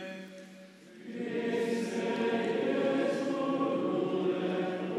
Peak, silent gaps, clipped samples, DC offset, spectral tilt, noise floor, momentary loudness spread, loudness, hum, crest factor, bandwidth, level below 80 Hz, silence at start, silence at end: -18 dBFS; none; under 0.1%; under 0.1%; -6 dB/octave; -52 dBFS; 17 LU; -32 LUFS; none; 14 dB; 13 kHz; -84 dBFS; 0 s; 0 s